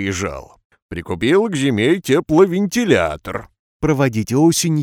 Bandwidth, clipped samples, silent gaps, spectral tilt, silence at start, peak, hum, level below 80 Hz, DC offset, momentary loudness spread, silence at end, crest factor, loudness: 17.5 kHz; under 0.1%; 0.65-0.70 s, 0.82-0.89 s, 3.59-3.80 s; -5.5 dB/octave; 0 s; 0 dBFS; none; -44 dBFS; under 0.1%; 14 LU; 0 s; 18 dB; -17 LUFS